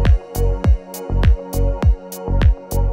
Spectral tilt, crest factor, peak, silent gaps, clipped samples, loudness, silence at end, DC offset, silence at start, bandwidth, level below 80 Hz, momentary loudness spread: -7 dB/octave; 14 dB; -2 dBFS; none; under 0.1%; -19 LUFS; 0 s; under 0.1%; 0 s; 16.5 kHz; -18 dBFS; 5 LU